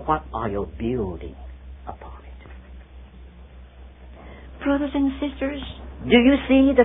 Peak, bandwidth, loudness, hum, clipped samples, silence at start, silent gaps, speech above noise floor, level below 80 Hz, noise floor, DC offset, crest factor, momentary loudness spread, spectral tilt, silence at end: -2 dBFS; 3.9 kHz; -22 LUFS; none; under 0.1%; 0 s; none; 23 dB; -38 dBFS; -44 dBFS; under 0.1%; 22 dB; 26 LU; -10.5 dB/octave; 0 s